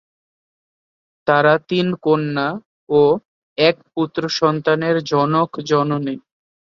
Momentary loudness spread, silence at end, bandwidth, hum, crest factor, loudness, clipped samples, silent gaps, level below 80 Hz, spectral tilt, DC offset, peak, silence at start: 9 LU; 0.45 s; 7.4 kHz; none; 18 dB; -18 LUFS; under 0.1%; 2.66-2.87 s, 3.25-3.56 s; -60 dBFS; -6 dB/octave; under 0.1%; -2 dBFS; 1.25 s